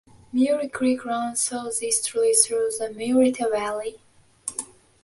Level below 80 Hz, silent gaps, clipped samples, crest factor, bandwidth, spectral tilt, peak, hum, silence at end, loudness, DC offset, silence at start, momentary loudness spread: -64 dBFS; none; under 0.1%; 22 dB; 12 kHz; -2 dB/octave; -2 dBFS; none; 0.4 s; -23 LUFS; under 0.1%; 0.35 s; 13 LU